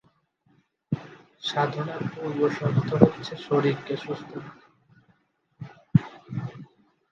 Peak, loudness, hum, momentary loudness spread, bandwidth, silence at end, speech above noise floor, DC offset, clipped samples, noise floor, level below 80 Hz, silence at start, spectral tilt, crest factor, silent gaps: 0 dBFS; -27 LUFS; none; 23 LU; 7.4 kHz; 0.45 s; 41 dB; under 0.1%; under 0.1%; -66 dBFS; -58 dBFS; 0.9 s; -7.5 dB/octave; 28 dB; none